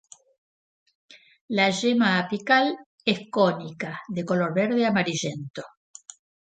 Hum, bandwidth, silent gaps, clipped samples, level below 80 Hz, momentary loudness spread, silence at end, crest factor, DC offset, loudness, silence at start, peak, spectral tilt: none; 9.2 kHz; 1.41-1.48 s, 2.86-2.98 s, 5.50-5.54 s; under 0.1%; -70 dBFS; 18 LU; 0.9 s; 20 dB; under 0.1%; -24 LUFS; 1.1 s; -6 dBFS; -5 dB/octave